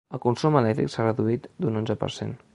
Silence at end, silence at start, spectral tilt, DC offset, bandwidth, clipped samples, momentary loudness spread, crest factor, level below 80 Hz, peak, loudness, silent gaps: 0.2 s; 0.1 s; -7.5 dB/octave; under 0.1%; 11 kHz; under 0.1%; 7 LU; 20 dB; -56 dBFS; -4 dBFS; -25 LUFS; none